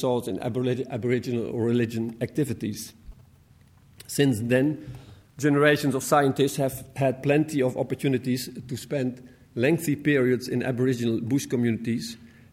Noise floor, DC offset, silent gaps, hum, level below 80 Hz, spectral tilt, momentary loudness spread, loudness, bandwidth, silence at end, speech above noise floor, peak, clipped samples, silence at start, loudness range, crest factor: -55 dBFS; under 0.1%; none; none; -58 dBFS; -6 dB/octave; 11 LU; -25 LUFS; 16.5 kHz; 0.25 s; 31 dB; -6 dBFS; under 0.1%; 0 s; 5 LU; 20 dB